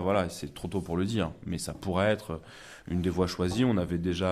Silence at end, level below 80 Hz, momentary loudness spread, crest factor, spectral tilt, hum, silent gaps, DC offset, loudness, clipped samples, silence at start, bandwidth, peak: 0 s; -46 dBFS; 11 LU; 16 dB; -6 dB/octave; none; none; under 0.1%; -30 LUFS; under 0.1%; 0 s; 15 kHz; -14 dBFS